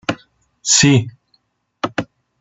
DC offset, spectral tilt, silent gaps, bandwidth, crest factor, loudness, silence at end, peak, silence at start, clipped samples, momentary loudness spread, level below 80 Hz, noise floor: under 0.1%; -3.5 dB/octave; none; 8.2 kHz; 18 dB; -16 LUFS; 0.35 s; 0 dBFS; 0.1 s; under 0.1%; 21 LU; -52 dBFS; -63 dBFS